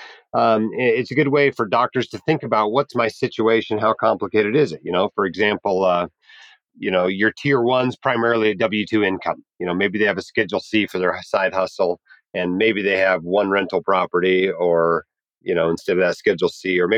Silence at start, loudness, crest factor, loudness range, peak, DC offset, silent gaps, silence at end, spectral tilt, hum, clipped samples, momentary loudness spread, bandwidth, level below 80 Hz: 0 s; -19 LUFS; 16 dB; 2 LU; -4 dBFS; under 0.1%; none; 0 s; -6 dB/octave; none; under 0.1%; 6 LU; 10 kHz; -66 dBFS